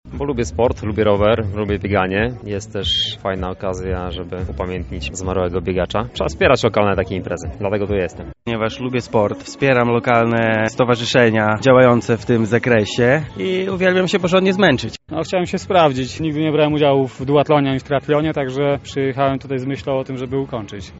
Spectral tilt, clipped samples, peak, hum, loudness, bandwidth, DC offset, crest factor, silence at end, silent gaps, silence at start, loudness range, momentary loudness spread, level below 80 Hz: -4.5 dB/octave; under 0.1%; 0 dBFS; none; -18 LUFS; 8 kHz; under 0.1%; 16 dB; 0 s; none; 0.05 s; 6 LU; 10 LU; -38 dBFS